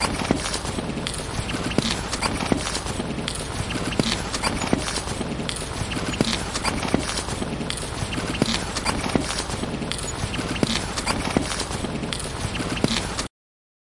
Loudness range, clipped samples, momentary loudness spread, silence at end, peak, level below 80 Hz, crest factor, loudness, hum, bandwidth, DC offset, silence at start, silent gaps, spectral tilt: 1 LU; under 0.1%; 5 LU; 0.7 s; -4 dBFS; -38 dBFS; 22 dB; -25 LUFS; none; 12 kHz; under 0.1%; 0 s; none; -4 dB/octave